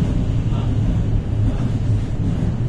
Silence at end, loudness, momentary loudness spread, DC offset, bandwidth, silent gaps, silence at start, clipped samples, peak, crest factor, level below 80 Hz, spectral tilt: 0 s; -21 LUFS; 1 LU; under 0.1%; 8.6 kHz; none; 0 s; under 0.1%; -8 dBFS; 12 dB; -24 dBFS; -8.5 dB/octave